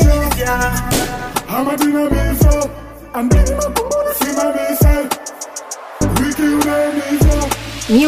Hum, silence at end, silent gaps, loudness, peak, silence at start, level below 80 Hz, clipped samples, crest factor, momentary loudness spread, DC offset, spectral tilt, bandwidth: none; 0 s; none; -16 LUFS; 0 dBFS; 0 s; -20 dBFS; under 0.1%; 14 dB; 10 LU; under 0.1%; -5.5 dB/octave; 16 kHz